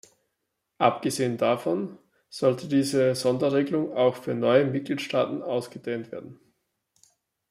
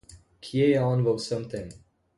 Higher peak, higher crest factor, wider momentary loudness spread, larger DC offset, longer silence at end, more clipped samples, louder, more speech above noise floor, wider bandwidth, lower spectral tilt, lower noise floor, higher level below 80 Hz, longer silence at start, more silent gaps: first, -6 dBFS vs -10 dBFS; about the same, 20 dB vs 16 dB; second, 11 LU vs 18 LU; neither; first, 1.15 s vs 0.45 s; neither; about the same, -25 LUFS vs -26 LUFS; first, 55 dB vs 23 dB; first, 15.5 kHz vs 11.5 kHz; second, -5.5 dB/octave vs -7 dB/octave; first, -80 dBFS vs -48 dBFS; second, -72 dBFS vs -58 dBFS; first, 0.8 s vs 0.1 s; neither